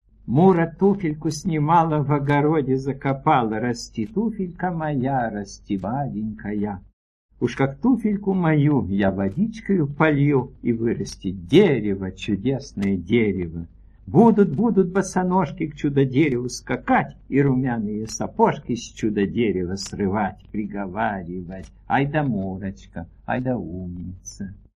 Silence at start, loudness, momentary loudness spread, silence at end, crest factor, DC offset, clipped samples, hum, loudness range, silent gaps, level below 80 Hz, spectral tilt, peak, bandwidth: 0.25 s; -22 LUFS; 13 LU; 0.2 s; 20 dB; under 0.1%; under 0.1%; none; 6 LU; 6.93-7.29 s; -48 dBFS; -7 dB/octave; -2 dBFS; 12 kHz